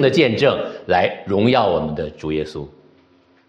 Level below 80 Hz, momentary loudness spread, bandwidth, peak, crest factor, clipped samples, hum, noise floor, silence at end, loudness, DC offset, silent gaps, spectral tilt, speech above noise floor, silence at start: -48 dBFS; 12 LU; 9.6 kHz; -2 dBFS; 18 dB; under 0.1%; none; -55 dBFS; 0.8 s; -18 LUFS; under 0.1%; none; -6.5 dB/octave; 37 dB; 0 s